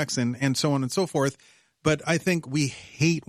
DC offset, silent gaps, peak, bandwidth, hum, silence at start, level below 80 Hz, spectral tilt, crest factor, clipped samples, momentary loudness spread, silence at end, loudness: under 0.1%; none; -8 dBFS; 14.5 kHz; none; 0 s; -58 dBFS; -5 dB/octave; 18 dB; under 0.1%; 4 LU; 0.1 s; -26 LUFS